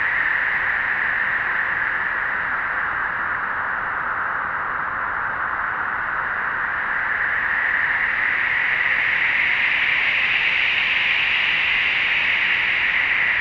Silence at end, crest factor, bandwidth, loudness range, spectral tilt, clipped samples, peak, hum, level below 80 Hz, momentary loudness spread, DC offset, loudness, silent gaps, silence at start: 0 s; 14 dB; 8 kHz; 6 LU; -3 dB/octave; under 0.1%; -6 dBFS; none; -50 dBFS; 6 LU; under 0.1%; -19 LUFS; none; 0 s